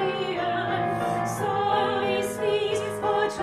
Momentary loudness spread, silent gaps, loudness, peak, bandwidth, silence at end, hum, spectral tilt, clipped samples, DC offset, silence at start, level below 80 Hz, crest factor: 3 LU; none; -26 LUFS; -12 dBFS; 13.5 kHz; 0 s; none; -4.5 dB/octave; under 0.1%; under 0.1%; 0 s; -58 dBFS; 14 dB